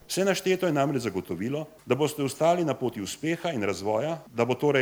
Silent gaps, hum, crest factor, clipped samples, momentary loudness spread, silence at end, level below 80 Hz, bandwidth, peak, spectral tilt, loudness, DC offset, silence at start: none; none; 18 dB; under 0.1%; 8 LU; 0 s; -66 dBFS; over 20 kHz; -10 dBFS; -5 dB/octave; -27 LUFS; under 0.1%; 0.1 s